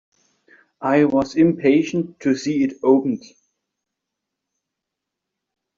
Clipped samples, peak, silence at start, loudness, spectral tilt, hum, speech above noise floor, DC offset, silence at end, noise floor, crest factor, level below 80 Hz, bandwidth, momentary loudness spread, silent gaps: under 0.1%; -4 dBFS; 0.8 s; -19 LUFS; -6.5 dB/octave; none; 65 dB; under 0.1%; 2.6 s; -83 dBFS; 18 dB; -60 dBFS; 7.4 kHz; 8 LU; none